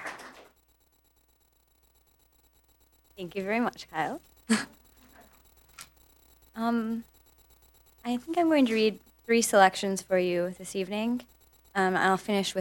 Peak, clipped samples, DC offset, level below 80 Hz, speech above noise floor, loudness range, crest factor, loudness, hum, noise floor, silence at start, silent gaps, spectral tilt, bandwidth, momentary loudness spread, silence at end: -6 dBFS; under 0.1%; under 0.1%; -66 dBFS; 40 dB; 11 LU; 26 dB; -28 LUFS; none; -67 dBFS; 0 s; none; -4 dB/octave; over 20 kHz; 20 LU; 0 s